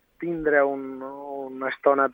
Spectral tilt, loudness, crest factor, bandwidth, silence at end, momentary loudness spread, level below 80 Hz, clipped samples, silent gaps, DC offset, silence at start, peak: -8.5 dB/octave; -25 LUFS; 18 dB; 4.8 kHz; 0 s; 14 LU; -60 dBFS; under 0.1%; none; under 0.1%; 0.2 s; -6 dBFS